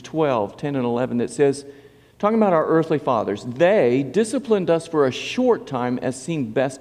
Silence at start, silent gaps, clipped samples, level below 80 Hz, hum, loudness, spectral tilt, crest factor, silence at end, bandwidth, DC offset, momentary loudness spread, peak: 0 s; none; under 0.1%; -62 dBFS; none; -21 LUFS; -6 dB/octave; 16 dB; 0 s; 11.5 kHz; under 0.1%; 7 LU; -4 dBFS